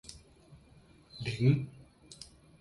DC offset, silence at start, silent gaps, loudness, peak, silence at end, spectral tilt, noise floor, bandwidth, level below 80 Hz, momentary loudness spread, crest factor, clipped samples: under 0.1%; 0.1 s; none; -31 LUFS; -14 dBFS; 0.35 s; -7 dB/octave; -60 dBFS; 11.5 kHz; -60 dBFS; 25 LU; 22 dB; under 0.1%